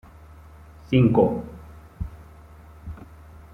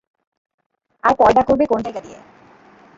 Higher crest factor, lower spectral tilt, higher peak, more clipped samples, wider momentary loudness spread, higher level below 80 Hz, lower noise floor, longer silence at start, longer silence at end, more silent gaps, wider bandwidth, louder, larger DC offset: about the same, 22 dB vs 18 dB; first, -9.5 dB/octave vs -6.5 dB/octave; about the same, -4 dBFS vs -2 dBFS; neither; first, 26 LU vs 15 LU; about the same, -44 dBFS vs -48 dBFS; about the same, -46 dBFS vs -48 dBFS; second, 0.9 s vs 1.05 s; second, 0.5 s vs 0.8 s; neither; second, 6 kHz vs 7.8 kHz; second, -21 LUFS vs -16 LUFS; neither